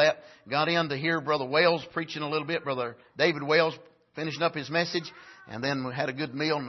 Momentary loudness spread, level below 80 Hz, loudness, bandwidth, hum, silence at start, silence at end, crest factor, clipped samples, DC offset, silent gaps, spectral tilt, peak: 12 LU; -72 dBFS; -28 LUFS; 6.2 kHz; none; 0 s; 0 s; 20 dB; under 0.1%; under 0.1%; none; -5 dB/octave; -10 dBFS